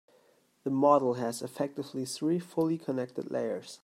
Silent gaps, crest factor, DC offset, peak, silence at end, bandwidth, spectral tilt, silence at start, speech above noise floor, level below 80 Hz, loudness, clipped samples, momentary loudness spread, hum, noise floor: none; 22 dB; under 0.1%; -10 dBFS; 0.05 s; 16 kHz; -6 dB/octave; 0.65 s; 36 dB; -80 dBFS; -31 LUFS; under 0.1%; 11 LU; none; -66 dBFS